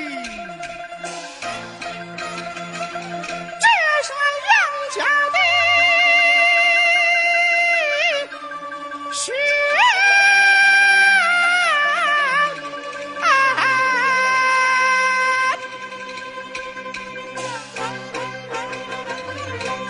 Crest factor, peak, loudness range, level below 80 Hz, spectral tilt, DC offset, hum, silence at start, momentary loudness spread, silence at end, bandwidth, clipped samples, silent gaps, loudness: 16 dB; -2 dBFS; 15 LU; -62 dBFS; -1 dB/octave; under 0.1%; none; 0 s; 18 LU; 0 s; 11.5 kHz; under 0.1%; none; -15 LUFS